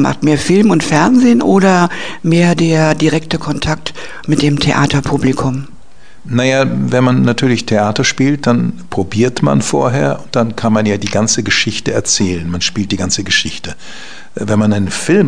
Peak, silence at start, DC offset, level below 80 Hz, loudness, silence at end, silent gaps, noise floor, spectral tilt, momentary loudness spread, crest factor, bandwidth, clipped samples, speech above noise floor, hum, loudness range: 0 dBFS; 0 s; 4%; -40 dBFS; -13 LUFS; 0 s; none; -44 dBFS; -5 dB/octave; 9 LU; 14 dB; 10 kHz; under 0.1%; 31 dB; none; 4 LU